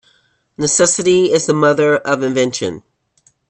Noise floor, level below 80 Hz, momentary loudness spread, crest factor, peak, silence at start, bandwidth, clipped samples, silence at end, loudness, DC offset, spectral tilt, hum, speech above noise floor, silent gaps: -57 dBFS; -56 dBFS; 10 LU; 16 dB; 0 dBFS; 0.6 s; 9 kHz; under 0.1%; 0.7 s; -14 LUFS; under 0.1%; -3.5 dB/octave; none; 43 dB; none